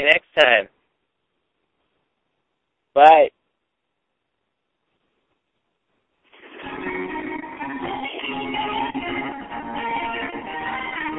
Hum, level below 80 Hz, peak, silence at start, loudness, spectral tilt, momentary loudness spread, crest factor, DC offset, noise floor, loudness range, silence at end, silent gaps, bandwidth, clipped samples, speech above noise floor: none; -56 dBFS; 0 dBFS; 0 s; -20 LUFS; -4.5 dB/octave; 17 LU; 24 dB; under 0.1%; -77 dBFS; 15 LU; 0 s; none; 8.2 kHz; under 0.1%; 63 dB